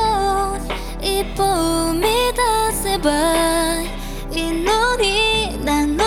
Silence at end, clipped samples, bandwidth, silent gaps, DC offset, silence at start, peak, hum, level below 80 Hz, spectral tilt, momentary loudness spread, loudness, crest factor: 0 s; under 0.1%; 19 kHz; none; under 0.1%; 0 s; -4 dBFS; none; -30 dBFS; -3 dB/octave; 8 LU; -18 LUFS; 14 dB